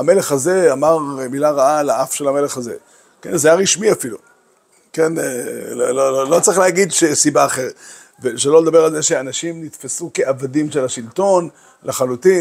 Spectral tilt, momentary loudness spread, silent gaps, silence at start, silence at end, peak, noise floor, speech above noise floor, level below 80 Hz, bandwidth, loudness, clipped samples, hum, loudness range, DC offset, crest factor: -3.5 dB/octave; 13 LU; none; 0 s; 0 s; 0 dBFS; -55 dBFS; 40 dB; -64 dBFS; 16 kHz; -16 LUFS; under 0.1%; none; 4 LU; under 0.1%; 16 dB